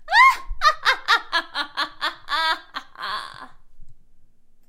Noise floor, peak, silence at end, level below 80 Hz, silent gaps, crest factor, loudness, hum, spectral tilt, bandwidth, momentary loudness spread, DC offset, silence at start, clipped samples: -47 dBFS; -2 dBFS; 0.5 s; -42 dBFS; none; 20 dB; -21 LUFS; none; -0.5 dB/octave; 16 kHz; 16 LU; under 0.1%; 0 s; under 0.1%